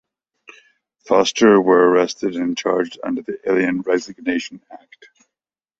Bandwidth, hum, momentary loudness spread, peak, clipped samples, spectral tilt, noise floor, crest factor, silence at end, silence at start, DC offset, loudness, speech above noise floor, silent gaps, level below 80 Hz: 8 kHz; none; 12 LU; -2 dBFS; under 0.1%; -4.5 dB/octave; -87 dBFS; 18 dB; 1.05 s; 1.05 s; under 0.1%; -18 LUFS; 70 dB; none; -62 dBFS